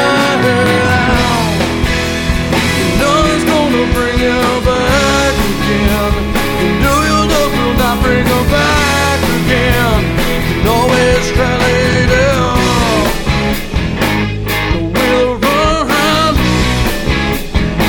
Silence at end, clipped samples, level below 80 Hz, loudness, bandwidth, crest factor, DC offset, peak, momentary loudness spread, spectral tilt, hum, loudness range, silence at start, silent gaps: 0 s; under 0.1%; -20 dBFS; -12 LUFS; over 20 kHz; 12 dB; under 0.1%; 0 dBFS; 4 LU; -5 dB/octave; none; 1 LU; 0 s; none